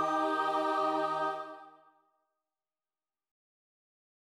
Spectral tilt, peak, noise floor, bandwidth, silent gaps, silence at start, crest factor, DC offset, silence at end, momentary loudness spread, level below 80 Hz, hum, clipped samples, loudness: -4.5 dB/octave; -20 dBFS; under -90 dBFS; 13 kHz; none; 0 s; 16 dB; under 0.1%; 2.6 s; 14 LU; -86 dBFS; none; under 0.1%; -32 LUFS